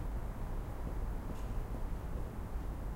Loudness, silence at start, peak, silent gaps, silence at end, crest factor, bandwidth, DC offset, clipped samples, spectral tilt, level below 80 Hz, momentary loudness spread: -43 LUFS; 0 s; -28 dBFS; none; 0 s; 12 dB; 16 kHz; under 0.1%; under 0.1%; -7.5 dB/octave; -40 dBFS; 1 LU